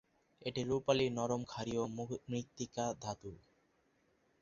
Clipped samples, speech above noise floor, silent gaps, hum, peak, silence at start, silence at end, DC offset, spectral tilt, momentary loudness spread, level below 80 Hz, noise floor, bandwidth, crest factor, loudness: under 0.1%; 37 dB; none; none; -18 dBFS; 0.4 s; 1.05 s; under 0.1%; -5 dB/octave; 11 LU; -68 dBFS; -75 dBFS; 7.6 kHz; 22 dB; -39 LUFS